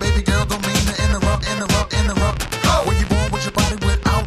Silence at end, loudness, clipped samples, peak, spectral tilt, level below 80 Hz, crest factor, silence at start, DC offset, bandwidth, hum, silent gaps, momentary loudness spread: 0 s; -19 LUFS; under 0.1%; -2 dBFS; -4.5 dB/octave; -22 dBFS; 14 dB; 0 s; under 0.1%; 15 kHz; none; none; 2 LU